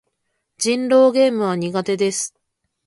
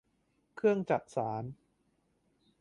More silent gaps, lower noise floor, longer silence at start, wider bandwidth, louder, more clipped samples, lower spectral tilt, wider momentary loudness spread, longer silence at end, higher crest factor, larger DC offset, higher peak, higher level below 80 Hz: neither; about the same, -73 dBFS vs -75 dBFS; about the same, 0.6 s vs 0.55 s; about the same, 11.5 kHz vs 11 kHz; first, -18 LUFS vs -33 LUFS; neither; second, -4 dB/octave vs -7.5 dB/octave; about the same, 10 LU vs 11 LU; second, 0.6 s vs 1.05 s; second, 14 dB vs 20 dB; neither; first, -4 dBFS vs -16 dBFS; first, -68 dBFS vs -74 dBFS